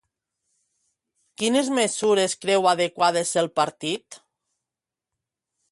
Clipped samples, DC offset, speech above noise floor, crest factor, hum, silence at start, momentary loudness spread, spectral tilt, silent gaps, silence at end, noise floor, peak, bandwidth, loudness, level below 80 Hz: under 0.1%; under 0.1%; 66 dB; 18 dB; none; 1.4 s; 7 LU; -3 dB/octave; none; 1.55 s; -88 dBFS; -6 dBFS; 11.5 kHz; -22 LUFS; -72 dBFS